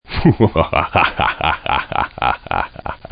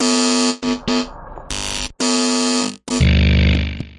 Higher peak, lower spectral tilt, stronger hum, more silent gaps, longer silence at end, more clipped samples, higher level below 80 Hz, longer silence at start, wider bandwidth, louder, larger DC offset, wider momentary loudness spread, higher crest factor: about the same, 0 dBFS vs -2 dBFS; first, -11.5 dB/octave vs -4 dB/octave; neither; neither; first, 0.15 s vs 0 s; neither; second, -32 dBFS vs -26 dBFS; about the same, 0.1 s vs 0 s; second, 5.2 kHz vs 11.5 kHz; about the same, -17 LUFS vs -17 LUFS; neither; about the same, 8 LU vs 10 LU; about the same, 18 dB vs 14 dB